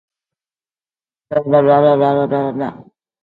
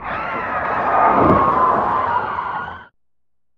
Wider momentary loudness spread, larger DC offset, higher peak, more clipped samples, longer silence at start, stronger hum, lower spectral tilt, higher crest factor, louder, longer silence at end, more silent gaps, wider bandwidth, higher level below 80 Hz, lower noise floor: about the same, 11 LU vs 11 LU; neither; about the same, 0 dBFS vs -2 dBFS; neither; first, 1.3 s vs 0 s; neither; first, -10 dB/octave vs -8.5 dB/octave; about the same, 16 dB vs 16 dB; first, -14 LUFS vs -17 LUFS; second, 0.4 s vs 0.75 s; neither; second, 4.5 kHz vs 6.8 kHz; second, -58 dBFS vs -44 dBFS; first, under -90 dBFS vs -83 dBFS